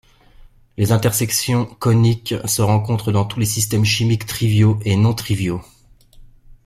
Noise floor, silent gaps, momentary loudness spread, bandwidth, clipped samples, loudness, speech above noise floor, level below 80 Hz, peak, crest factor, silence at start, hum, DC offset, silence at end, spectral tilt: -47 dBFS; none; 6 LU; 15.5 kHz; under 0.1%; -18 LUFS; 31 dB; -46 dBFS; -2 dBFS; 16 dB; 0.4 s; none; under 0.1%; 0.15 s; -5 dB/octave